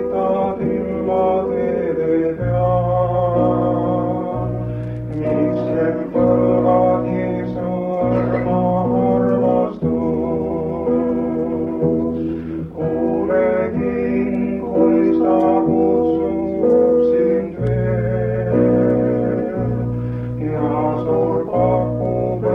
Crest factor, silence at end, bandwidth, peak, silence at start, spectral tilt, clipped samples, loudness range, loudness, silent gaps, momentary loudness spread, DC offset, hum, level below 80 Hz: 14 dB; 0 s; 4 kHz; -2 dBFS; 0 s; -11 dB/octave; under 0.1%; 3 LU; -18 LUFS; none; 7 LU; under 0.1%; none; -40 dBFS